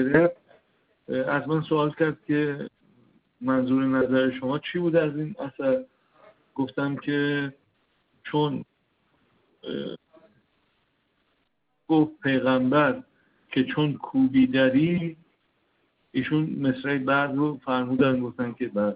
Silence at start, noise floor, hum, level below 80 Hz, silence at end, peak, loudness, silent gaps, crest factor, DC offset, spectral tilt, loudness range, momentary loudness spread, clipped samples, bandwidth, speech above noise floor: 0 s; -74 dBFS; none; -64 dBFS; 0 s; -6 dBFS; -25 LUFS; none; 20 dB; under 0.1%; -5.5 dB/octave; 9 LU; 13 LU; under 0.1%; 5 kHz; 50 dB